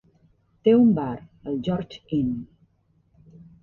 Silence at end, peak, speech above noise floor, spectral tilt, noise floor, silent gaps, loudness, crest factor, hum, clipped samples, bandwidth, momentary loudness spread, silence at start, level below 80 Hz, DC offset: 1.15 s; -8 dBFS; 42 dB; -9.5 dB/octave; -64 dBFS; none; -23 LUFS; 18 dB; none; under 0.1%; 4.3 kHz; 15 LU; 0.65 s; -56 dBFS; under 0.1%